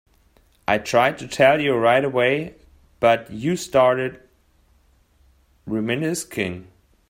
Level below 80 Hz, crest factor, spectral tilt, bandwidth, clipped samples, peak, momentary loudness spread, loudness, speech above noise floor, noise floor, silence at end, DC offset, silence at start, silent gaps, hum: -56 dBFS; 18 dB; -5 dB/octave; 16 kHz; under 0.1%; -4 dBFS; 11 LU; -20 LUFS; 39 dB; -59 dBFS; 0.45 s; under 0.1%; 0.7 s; none; none